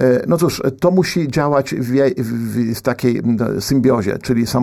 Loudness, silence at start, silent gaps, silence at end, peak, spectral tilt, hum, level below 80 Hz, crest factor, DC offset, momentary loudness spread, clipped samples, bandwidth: -17 LUFS; 0 s; none; 0 s; -2 dBFS; -6.5 dB/octave; none; -44 dBFS; 14 dB; under 0.1%; 4 LU; under 0.1%; 15 kHz